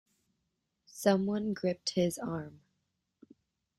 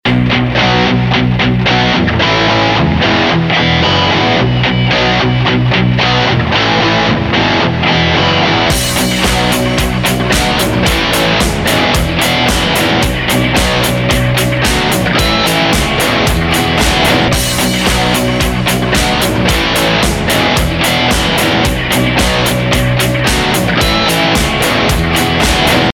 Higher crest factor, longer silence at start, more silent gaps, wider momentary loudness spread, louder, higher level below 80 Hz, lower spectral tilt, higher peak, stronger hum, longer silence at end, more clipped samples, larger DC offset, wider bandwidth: first, 24 dB vs 10 dB; first, 0.95 s vs 0.05 s; neither; first, 14 LU vs 2 LU; second, -32 LUFS vs -11 LUFS; second, -70 dBFS vs -24 dBFS; first, -5.5 dB/octave vs -4 dB/octave; second, -12 dBFS vs 0 dBFS; neither; first, 1.3 s vs 0 s; neither; neither; second, 14 kHz vs 19 kHz